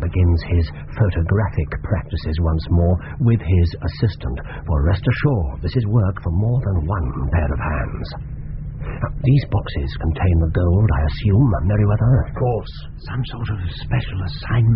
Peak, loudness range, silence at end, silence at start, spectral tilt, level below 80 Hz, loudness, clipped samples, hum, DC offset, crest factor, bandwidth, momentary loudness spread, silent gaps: -4 dBFS; 4 LU; 0 s; 0 s; -7.5 dB/octave; -26 dBFS; -20 LUFS; under 0.1%; none; under 0.1%; 14 dB; 5.6 kHz; 10 LU; none